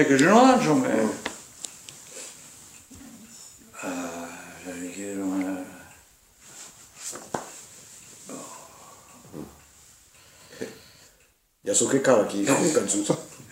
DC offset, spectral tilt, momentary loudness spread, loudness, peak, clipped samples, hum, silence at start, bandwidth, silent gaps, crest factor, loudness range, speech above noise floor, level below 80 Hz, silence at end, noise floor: under 0.1%; -4 dB/octave; 24 LU; -24 LUFS; -2 dBFS; under 0.1%; none; 0 s; 16 kHz; none; 26 dB; 18 LU; 42 dB; -66 dBFS; 0.1 s; -62 dBFS